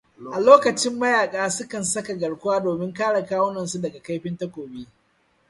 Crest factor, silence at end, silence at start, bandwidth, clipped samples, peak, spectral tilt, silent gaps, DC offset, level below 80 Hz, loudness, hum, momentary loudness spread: 22 dB; 0.65 s; 0.2 s; 11.5 kHz; under 0.1%; 0 dBFS; -4 dB/octave; none; under 0.1%; -64 dBFS; -22 LUFS; none; 17 LU